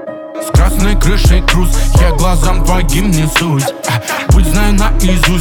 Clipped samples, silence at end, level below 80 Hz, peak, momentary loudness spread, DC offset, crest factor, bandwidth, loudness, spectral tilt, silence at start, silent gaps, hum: under 0.1%; 0 s; -12 dBFS; 0 dBFS; 4 LU; under 0.1%; 10 dB; 18 kHz; -12 LUFS; -5 dB/octave; 0 s; none; none